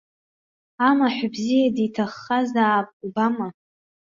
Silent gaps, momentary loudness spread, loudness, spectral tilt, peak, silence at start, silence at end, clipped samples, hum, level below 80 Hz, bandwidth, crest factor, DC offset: 2.93-3.00 s; 9 LU; -22 LUFS; -5.5 dB/octave; -4 dBFS; 0.8 s; 0.65 s; under 0.1%; none; -66 dBFS; 7.6 kHz; 18 dB; under 0.1%